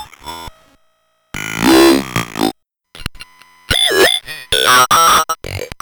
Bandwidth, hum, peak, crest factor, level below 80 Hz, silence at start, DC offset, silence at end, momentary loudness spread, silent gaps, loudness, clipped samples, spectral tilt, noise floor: over 20 kHz; none; -4 dBFS; 10 dB; -38 dBFS; 0 s; under 0.1%; 0.1 s; 21 LU; none; -12 LUFS; under 0.1%; -2.5 dB/octave; -60 dBFS